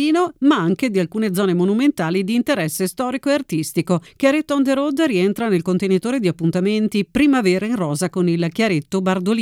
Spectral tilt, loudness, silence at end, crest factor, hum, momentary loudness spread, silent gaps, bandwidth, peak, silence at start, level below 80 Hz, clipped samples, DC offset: -6 dB/octave; -19 LUFS; 0 s; 16 dB; none; 4 LU; none; 16.5 kHz; -2 dBFS; 0 s; -54 dBFS; under 0.1%; under 0.1%